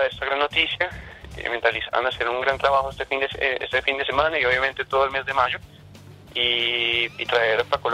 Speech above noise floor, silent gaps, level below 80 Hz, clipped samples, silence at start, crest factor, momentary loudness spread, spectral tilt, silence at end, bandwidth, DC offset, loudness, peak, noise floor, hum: 22 dB; none; -48 dBFS; under 0.1%; 0 s; 18 dB; 6 LU; -4 dB/octave; 0 s; 14 kHz; under 0.1%; -22 LUFS; -4 dBFS; -45 dBFS; none